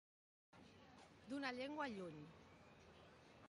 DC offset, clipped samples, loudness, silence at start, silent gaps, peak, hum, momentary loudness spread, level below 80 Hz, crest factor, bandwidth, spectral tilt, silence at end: under 0.1%; under 0.1%; -50 LUFS; 0.55 s; none; -32 dBFS; none; 18 LU; -80 dBFS; 22 dB; 11 kHz; -5 dB/octave; 0 s